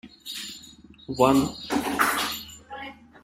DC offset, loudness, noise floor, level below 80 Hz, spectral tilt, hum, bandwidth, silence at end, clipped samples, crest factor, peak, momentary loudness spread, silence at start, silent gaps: under 0.1%; -25 LUFS; -49 dBFS; -54 dBFS; -4 dB/octave; none; 16 kHz; 0.05 s; under 0.1%; 22 dB; -4 dBFS; 20 LU; 0.05 s; none